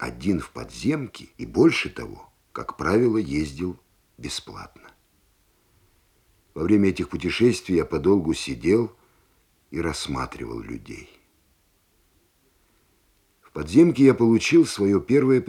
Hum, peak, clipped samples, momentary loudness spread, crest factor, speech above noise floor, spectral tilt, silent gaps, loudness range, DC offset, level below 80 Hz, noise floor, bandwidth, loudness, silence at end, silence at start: none; -4 dBFS; under 0.1%; 20 LU; 20 dB; 43 dB; -6 dB/octave; none; 14 LU; under 0.1%; -50 dBFS; -65 dBFS; 13 kHz; -22 LUFS; 0 s; 0 s